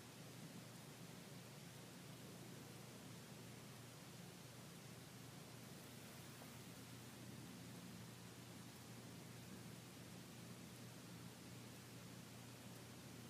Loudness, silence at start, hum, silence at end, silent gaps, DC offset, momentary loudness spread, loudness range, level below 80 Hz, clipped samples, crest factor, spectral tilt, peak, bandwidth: -57 LUFS; 0 s; none; 0 s; none; under 0.1%; 1 LU; 1 LU; -82 dBFS; under 0.1%; 12 dB; -4 dB/octave; -46 dBFS; 15.5 kHz